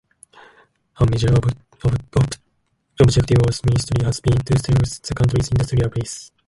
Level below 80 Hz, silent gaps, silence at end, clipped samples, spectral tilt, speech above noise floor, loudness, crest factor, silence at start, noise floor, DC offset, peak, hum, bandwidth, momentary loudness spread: -34 dBFS; none; 0.2 s; under 0.1%; -6.5 dB/octave; 50 dB; -19 LUFS; 16 dB; 1 s; -67 dBFS; under 0.1%; -2 dBFS; none; 11.5 kHz; 8 LU